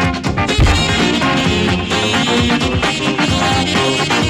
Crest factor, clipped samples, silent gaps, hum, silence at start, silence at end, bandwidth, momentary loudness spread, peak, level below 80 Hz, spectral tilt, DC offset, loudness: 10 dB; under 0.1%; none; none; 0 s; 0 s; 16 kHz; 2 LU; -4 dBFS; -24 dBFS; -4.5 dB/octave; under 0.1%; -14 LUFS